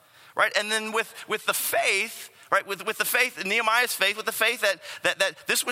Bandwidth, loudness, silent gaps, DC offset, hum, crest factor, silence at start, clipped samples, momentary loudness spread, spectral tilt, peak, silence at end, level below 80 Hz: 16.5 kHz; -24 LUFS; none; under 0.1%; none; 22 dB; 0.35 s; under 0.1%; 7 LU; -0.5 dB/octave; -6 dBFS; 0 s; -82 dBFS